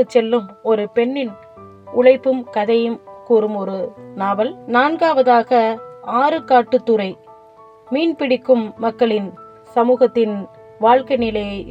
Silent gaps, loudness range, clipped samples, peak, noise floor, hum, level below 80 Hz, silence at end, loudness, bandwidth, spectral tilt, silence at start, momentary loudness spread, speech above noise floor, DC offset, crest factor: none; 2 LU; under 0.1%; 0 dBFS; -44 dBFS; none; -54 dBFS; 0 s; -17 LUFS; 8 kHz; -7 dB/octave; 0 s; 11 LU; 28 dB; under 0.1%; 18 dB